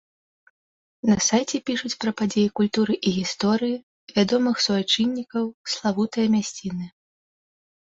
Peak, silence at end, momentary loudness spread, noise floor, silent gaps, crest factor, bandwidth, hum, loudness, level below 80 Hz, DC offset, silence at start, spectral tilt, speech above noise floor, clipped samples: -8 dBFS; 1.05 s; 8 LU; under -90 dBFS; 3.83-4.07 s, 5.54-5.64 s; 16 dB; 8 kHz; none; -23 LUFS; -60 dBFS; under 0.1%; 1.05 s; -4 dB/octave; over 67 dB; under 0.1%